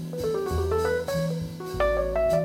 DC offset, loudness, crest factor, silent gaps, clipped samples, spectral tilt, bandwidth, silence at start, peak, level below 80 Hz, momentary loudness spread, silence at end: under 0.1%; -27 LUFS; 12 dB; none; under 0.1%; -6.5 dB/octave; 16.5 kHz; 0 s; -12 dBFS; -38 dBFS; 6 LU; 0 s